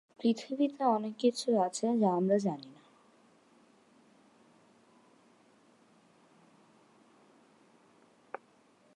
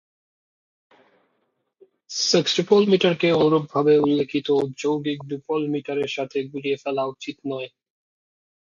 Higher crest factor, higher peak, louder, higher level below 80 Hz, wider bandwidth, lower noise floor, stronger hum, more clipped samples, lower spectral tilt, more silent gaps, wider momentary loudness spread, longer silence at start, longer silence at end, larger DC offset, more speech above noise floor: about the same, 20 dB vs 18 dB; second, -16 dBFS vs -4 dBFS; second, -31 LUFS vs -22 LUFS; second, -88 dBFS vs -66 dBFS; first, 11.5 kHz vs 7.4 kHz; second, -65 dBFS vs -72 dBFS; neither; neither; about the same, -6 dB/octave vs -5 dB/octave; neither; first, 20 LU vs 13 LU; second, 0.2 s vs 2.1 s; first, 6.2 s vs 1.05 s; neither; second, 35 dB vs 51 dB